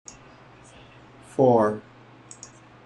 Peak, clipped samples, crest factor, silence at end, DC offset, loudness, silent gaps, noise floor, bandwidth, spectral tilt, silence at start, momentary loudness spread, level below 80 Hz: -6 dBFS; under 0.1%; 22 dB; 1.05 s; under 0.1%; -22 LUFS; none; -50 dBFS; 11 kHz; -7 dB/octave; 1.4 s; 26 LU; -62 dBFS